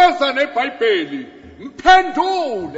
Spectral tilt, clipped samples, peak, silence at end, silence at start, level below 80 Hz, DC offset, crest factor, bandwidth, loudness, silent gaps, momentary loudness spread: -3 dB/octave; under 0.1%; 0 dBFS; 0 s; 0 s; -46 dBFS; under 0.1%; 16 dB; 8 kHz; -16 LUFS; none; 22 LU